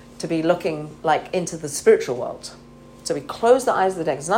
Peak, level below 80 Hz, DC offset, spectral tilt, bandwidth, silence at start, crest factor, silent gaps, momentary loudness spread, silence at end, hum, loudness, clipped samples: -4 dBFS; -56 dBFS; under 0.1%; -4.5 dB/octave; 16.5 kHz; 0.05 s; 18 dB; none; 12 LU; 0 s; none; -21 LUFS; under 0.1%